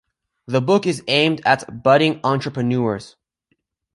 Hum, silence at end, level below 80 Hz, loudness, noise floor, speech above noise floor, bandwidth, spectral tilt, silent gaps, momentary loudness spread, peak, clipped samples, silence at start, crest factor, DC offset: none; 0.85 s; -60 dBFS; -18 LUFS; -70 dBFS; 52 dB; 11.5 kHz; -5.5 dB/octave; none; 7 LU; -2 dBFS; under 0.1%; 0.5 s; 18 dB; under 0.1%